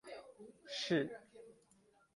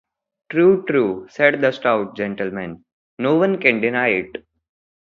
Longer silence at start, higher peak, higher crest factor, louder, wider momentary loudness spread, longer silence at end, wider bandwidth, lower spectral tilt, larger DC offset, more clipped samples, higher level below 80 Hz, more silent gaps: second, 0.05 s vs 0.5 s; second, -22 dBFS vs 0 dBFS; about the same, 22 dB vs 20 dB; second, -39 LUFS vs -18 LUFS; first, 23 LU vs 11 LU; about the same, 0.6 s vs 0.65 s; first, 11.5 kHz vs 6.8 kHz; second, -4.5 dB/octave vs -7.5 dB/octave; neither; neither; second, -82 dBFS vs -60 dBFS; second, none vs 2.93-3.17 s